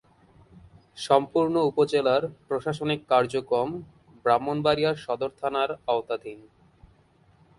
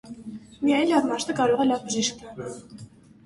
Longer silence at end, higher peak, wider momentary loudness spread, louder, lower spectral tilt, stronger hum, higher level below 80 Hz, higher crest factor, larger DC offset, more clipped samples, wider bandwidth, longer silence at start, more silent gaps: first, 1.2 s vs 0.4 s; first, -4 dBFS vs -10 dBFS; second, 9 LU vs 19 LU; about the same, -25 LUFS vs -23 LUFS; first, -6 dB/octave vs -3.5 dB/octave; neither; about the same, -62 dBFS vs -62 dBFS; first, 22 dB vs 16 dB; neither; neither; about the same, 11.5 kHz vs 11.5 kHz; first, 0.55 s vs 0.05 s; neither